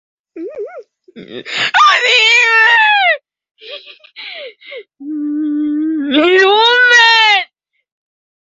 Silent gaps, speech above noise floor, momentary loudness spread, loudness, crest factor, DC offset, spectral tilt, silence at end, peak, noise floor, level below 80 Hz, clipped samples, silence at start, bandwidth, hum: none; 25 dB; 24 LU; -9 LUFS; 14 dB; under 0.1%; -1 dB/octave; 1 s; 0 dBFS; -37 dBFS; -66 dBFS; under 0.1%; 0.35 s; 8 kHz; none